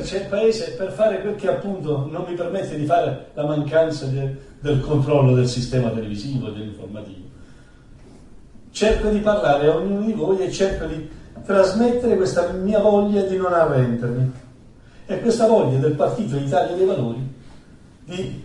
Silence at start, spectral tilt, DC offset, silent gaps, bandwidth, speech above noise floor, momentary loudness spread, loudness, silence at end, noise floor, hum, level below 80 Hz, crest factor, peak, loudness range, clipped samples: 0 s; -7 dB/octave; under 0.1%; none; 11 kHz; 26 dB; 13 LU; -20 LUFS; 0 s; -45 dBFS; none; -40 dBFS; 18 dB; -2 dBFS; 4 LU; under 0.1%